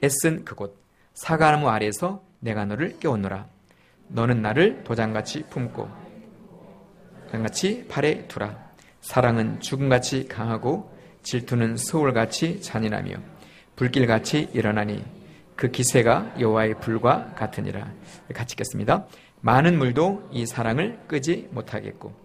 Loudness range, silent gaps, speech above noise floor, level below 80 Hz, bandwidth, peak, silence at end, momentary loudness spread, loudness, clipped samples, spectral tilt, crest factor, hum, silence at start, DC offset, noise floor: 4 LU; none; 33 dB; -54 dBFS; 15.5 kHz; -2 dBFS; 0.1 s; 16 LU; -24 LUFS; under 0.1%; -5.5 dB/octave; 22 dB; none; 0 s; under 0.1%; -57 dBFS